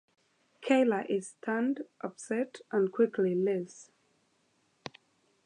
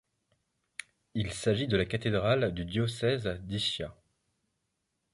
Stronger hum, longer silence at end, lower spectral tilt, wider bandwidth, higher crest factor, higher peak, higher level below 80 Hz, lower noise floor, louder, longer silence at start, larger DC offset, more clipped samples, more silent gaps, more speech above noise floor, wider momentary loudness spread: neither; first, 1.6 s vs 1.2 s; about the same, -6 dB/octave vs -5.5 dB/octave; about the same, 11 kHz vs 11.5 kHz; about the same, 20 dB vs 20 dB; about the same, -12 dBFS vs -12 dBFS; second, -84 dBFS vs -52 dBFS; second, -73 dBFS vs -81 dBFS; about the same, -31 LUFS vs -31 LUFS; second, 0.6 s vs 1.15 s; neither; neither; neither; second, 42 dB vs 51 dB; first, 19 LU vs 16 LU